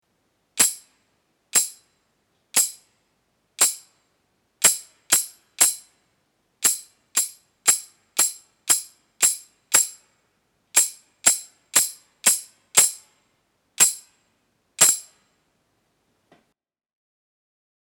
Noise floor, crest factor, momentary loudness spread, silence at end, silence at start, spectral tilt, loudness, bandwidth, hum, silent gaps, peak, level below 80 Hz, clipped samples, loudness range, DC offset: -76 dBFS; 26 dB; 12 LU; 2.85 s; 0.55 s; 2 dB/octave; -20 LUFS; over 20 kHz; none; none; 0 dBFS; -70 dBFS; under 0.1%; 4 LU; under 0.1%